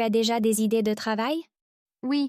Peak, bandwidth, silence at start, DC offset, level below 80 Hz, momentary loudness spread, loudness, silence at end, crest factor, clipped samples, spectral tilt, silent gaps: -14 dBFS; 15.5 kHz; 0 s; under 0.1%; -70 dBFS; 8 LU; -25 LUFS; 0 s; 12 dB; under 0.1%; -4.5 dB/octave; 1.62-1.86 s